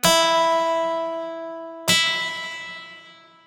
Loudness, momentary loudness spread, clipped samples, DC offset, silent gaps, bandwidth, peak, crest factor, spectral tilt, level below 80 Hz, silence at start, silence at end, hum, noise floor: -21 LUFS; 17 LU; under 0.1%; under 0.1%; none; over 20 kHz; -4 dBFS; 18 dB; -1.5 dB/octave; -58 dBFS; 0.05 s; 0.35 s; none; -48 dBFS